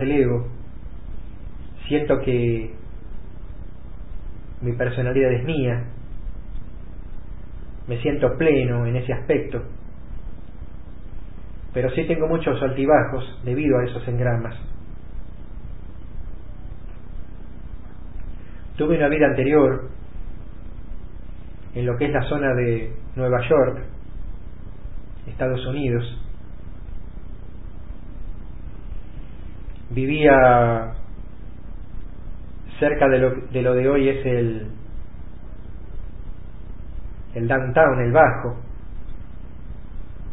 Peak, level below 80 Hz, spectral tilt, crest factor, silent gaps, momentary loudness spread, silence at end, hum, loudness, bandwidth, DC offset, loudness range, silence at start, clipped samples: 0 dBFS; -36 dBFS; -12 dB/octave; 22 dB; none; 23 LU; 0 s; none; -21 LUFS; 4 kHz; 3%; 11 LU; 0 s; under 0.1%